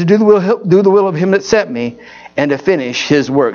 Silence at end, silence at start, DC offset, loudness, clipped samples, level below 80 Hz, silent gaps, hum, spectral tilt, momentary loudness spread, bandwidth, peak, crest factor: 0 s; 0 s; under 0.1%; -12 LUFS; under 0.1%; -50 dBFS; none; none; -6 dB/octave; 10 LU; 7.2 kHz; 0 dBFS; 12 dB